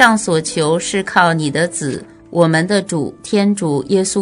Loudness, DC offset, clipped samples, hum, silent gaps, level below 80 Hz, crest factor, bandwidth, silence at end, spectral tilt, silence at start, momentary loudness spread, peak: -16 LUFS; under 0.1%; 0.2%; none; none; -54 dBFS; 16 dB; 11 kHz; 0 s; -4.5 dB/octave; 0 s; 9 LU; 0 dBFS